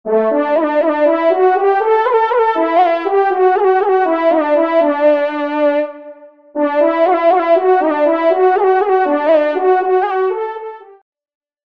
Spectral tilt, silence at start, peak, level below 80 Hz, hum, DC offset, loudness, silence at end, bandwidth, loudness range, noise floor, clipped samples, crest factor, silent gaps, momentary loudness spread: -6 dB/octave; 0.05 s; -2 dBFS; -68 dBFS; none; 0.3%; -13 LUFS; 0.9 s; 5.4 kHz; 2 LU; -37 dBFS; under 0.1%; 12 dB; none; 5 LU